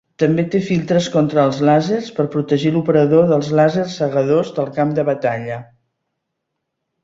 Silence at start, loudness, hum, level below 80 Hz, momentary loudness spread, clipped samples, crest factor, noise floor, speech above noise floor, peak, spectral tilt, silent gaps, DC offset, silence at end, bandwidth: 0.2 s; -16 LUFS; none; -56 dBFS; 7 LU; under 0.1%; 16 dB; -76 dBFS; 60 dB; -2 dBFS; -7 dB/octave; none; under 0.1%; 1.4 s; 7.8 kHz